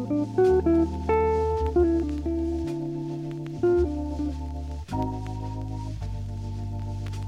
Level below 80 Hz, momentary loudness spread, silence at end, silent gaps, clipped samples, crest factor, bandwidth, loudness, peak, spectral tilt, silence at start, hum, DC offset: -36 dBFS; 12 LU; 0 s; none; under 0.1%; 14 dB; 10 kHz; -27 LUFS; -12 dBFS; -9 dB/octave; 0 s; none; under 0.1%